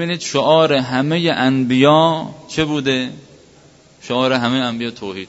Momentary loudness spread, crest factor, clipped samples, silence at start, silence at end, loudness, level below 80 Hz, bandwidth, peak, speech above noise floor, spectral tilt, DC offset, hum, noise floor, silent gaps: 12 LU; 16 dB; under 0.1%; 0 s; 0.05 s; -16 LUFS; -54 dBFS; 8 kHz; 0 dBFS; 31 dB; -5.5 dB/octave; under 0.1%; none; -47 dBFS; none